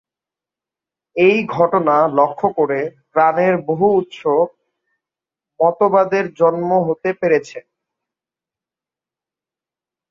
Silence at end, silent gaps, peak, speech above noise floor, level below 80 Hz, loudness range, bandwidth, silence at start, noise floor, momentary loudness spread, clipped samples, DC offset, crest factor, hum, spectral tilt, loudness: 2.5 s; none; -2 dBFS; 73 dB; -64 dBFS; 5 LU; 7.4 kHz; 1.15 s; -89 dBFS; 6 LU; under 0.1%; under 0.1%; 16 dB; none; -7.5 dB/octave; -16 LUFS